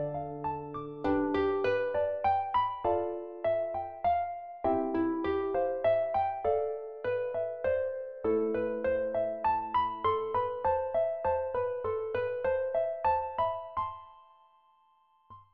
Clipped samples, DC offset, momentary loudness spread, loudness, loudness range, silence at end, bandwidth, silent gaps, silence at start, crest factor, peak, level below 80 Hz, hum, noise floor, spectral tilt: under 0.1%; 0.1%; 7 LU; -31 LUFS; 2 LU; 0.1 s; 5.2 kHz; none; 0 s; 14 dB; -16 dBFS; -58 dBFS; none; -67 dBFS; -4.5 dB/octave